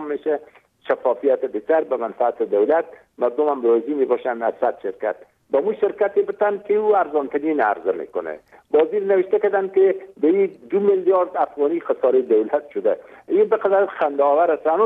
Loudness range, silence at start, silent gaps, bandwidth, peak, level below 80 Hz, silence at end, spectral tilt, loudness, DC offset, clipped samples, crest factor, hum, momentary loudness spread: 2 LU; 0 s; none; 3.9 kHz; -6 dBFS; -70 dBFS; 0 s; -8.5 dB/octave; -20 LUFS; under 0.1%; under 0.1%; 14 dB; none; 8 LU